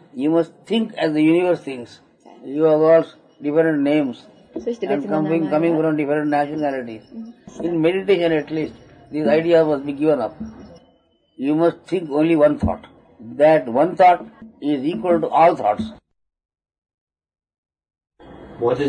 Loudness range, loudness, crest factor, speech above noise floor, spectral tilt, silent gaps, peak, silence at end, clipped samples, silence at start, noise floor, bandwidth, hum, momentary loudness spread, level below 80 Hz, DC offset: 4 LU; -19 LUFS; 16 dB; 41 dB; -7.5 dB/octave; 16.78-16.82 s, 16.94-17.07 s, 17.58-17.63 s; -4 dBFS; 0 s; under 0.1%; 0.15 s; -59 dBFS; 10 kHz; none; 17 LU; -50 dBFS; under 0.1%